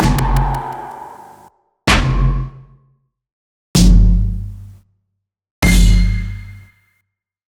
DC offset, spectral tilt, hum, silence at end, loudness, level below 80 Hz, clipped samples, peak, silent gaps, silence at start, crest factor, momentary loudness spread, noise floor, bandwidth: under 0.1%; -5 dB/octave; none; 0.9 s; -16 LUFS; -18 dBFS; under 0.1%; 0 dBFS; 3.32-3.74 s, 5.51-5.62 s; 0 s; 16 dB; 20 LU; -73 dBFS; 16.5 kHz